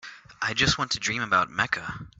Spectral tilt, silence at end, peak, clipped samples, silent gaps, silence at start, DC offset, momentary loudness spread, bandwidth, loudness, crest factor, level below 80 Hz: -2.5 dB/octave; 0.15 s; -6 dBFS; under 0.1%; none; 0.05 s; under 0.1%; 8 LU; 8.4 kHz; -25 LUFS; 22 dB; -50 dBFS